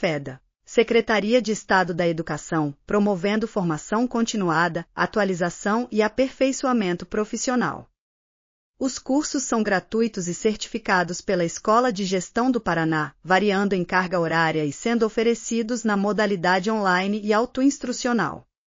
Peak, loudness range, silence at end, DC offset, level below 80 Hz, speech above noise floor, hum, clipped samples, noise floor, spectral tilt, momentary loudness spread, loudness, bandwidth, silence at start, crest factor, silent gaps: -6 dBFS; 3 LU; 0.25 s; under 0.1%; -54 dBFS; over 68 dB; none; under 0.1%; under -90 dBFS; -4 dB/octave; 6 LU; -23 LUFS; 7.4 kHz; 0 s; 18 dB; 7.98-8.74 s